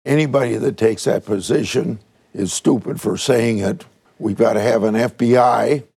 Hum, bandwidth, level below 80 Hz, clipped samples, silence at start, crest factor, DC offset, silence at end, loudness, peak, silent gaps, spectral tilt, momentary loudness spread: none; 15 kHz; -58 dBFS; under 0.1%; 0.05 s; 16 dB; under 0.1%; 0.15 s; -18 LUFS; -2 dBFS; none; -5.5 dB/octave; 11 LU